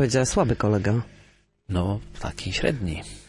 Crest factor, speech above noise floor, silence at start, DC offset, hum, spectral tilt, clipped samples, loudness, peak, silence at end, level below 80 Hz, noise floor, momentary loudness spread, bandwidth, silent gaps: 16 dB; 33 dB; 0 s; under 0.1%; 50 Hz at -50 dBFS; -5.5 dB/octave; under 0.1%; -25 LUFS; -8 dBFS; 0.05 s; -40 dBFS; -57 dBFS; 11 LU; 11.5 kHz; none